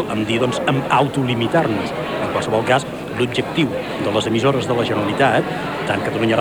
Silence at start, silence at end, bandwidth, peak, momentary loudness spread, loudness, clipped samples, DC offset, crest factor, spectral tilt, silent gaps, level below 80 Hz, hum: 0 s; 0 s; over 20 kHz; -2 dBFS; 6 LU; -19 LUFS; under 0.1%; under 0.1%; 16 dB; -5.5 dB/octave; none; -48 dBFS; none